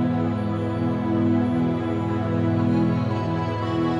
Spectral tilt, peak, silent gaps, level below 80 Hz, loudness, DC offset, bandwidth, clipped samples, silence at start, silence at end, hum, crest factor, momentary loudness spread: -9 dB/octave; -10 dBFS; none; -48 dBFS; -23 LUFS; under 0.1%; 7.6 kHz; under 0.1%; 0 s; 0 s; none; 12 dB; 4 LU